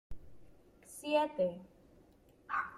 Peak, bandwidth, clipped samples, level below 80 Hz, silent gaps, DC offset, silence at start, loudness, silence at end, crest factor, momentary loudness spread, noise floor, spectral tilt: -20 dBFS; 14 kHz; under 0.1%; -62 dBFS; none; under 0.1%; 0.1 s; -36 LUFS; 0 s; 20 dB; 24 LU; -64 dBFS; -4.5 dB/octave